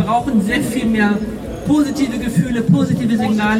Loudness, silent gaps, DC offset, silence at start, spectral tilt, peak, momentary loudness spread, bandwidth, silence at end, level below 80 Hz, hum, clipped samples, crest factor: -17 LUFS; none; under 0.1%; 0 s; -6.5 dB/octave; -2 dBFS; 4 LU; 15.5 kHz; 0 s; -38 dBFS; none; under 0.1%; 14 dB